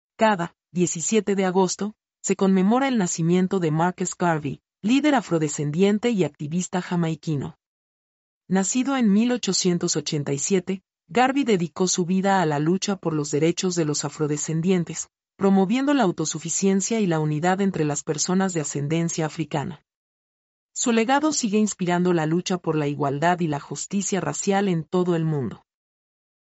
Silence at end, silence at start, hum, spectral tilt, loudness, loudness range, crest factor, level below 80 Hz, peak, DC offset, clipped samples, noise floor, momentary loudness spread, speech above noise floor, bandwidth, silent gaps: 0.9 s; 0.2 s; none; -5 dB/octave; -23 LUFS; 3 LU; 16 dB; -66 dBFS; -8 dBFS; under 0.1%; under 0.1%; under -90 dBFS; 8 LU; over 68 dB; 8.2 kHz; 7.66-8.41 s, 19.95-20.69 s